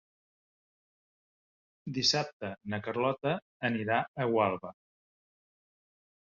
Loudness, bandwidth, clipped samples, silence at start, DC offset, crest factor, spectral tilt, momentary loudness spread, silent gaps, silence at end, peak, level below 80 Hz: -31 LUFS; 7.2 kHz; under 0.1%; 1.85 s; under 0.1%; 22 dB; -3 dB/octave; 13 LU; 2.33-2.40 s, 3.42-3.60 s, 4.08-4.14 s; 1.65 s; -12 dBFS; -70 dBFS